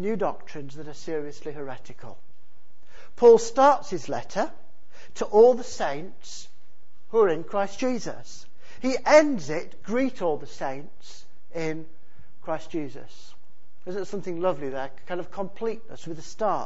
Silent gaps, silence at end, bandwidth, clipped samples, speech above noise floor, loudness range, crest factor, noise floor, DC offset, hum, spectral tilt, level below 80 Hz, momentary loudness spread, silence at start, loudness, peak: none; 0 s; 8 kHz; under 0.1%; 40 dB; 13 LU; 22 dB; -65 dBFS; 4%; none; -5 dB/octave; -60 dBFS; 22 LU; 0 s; -25 LUFS; -4 dBFS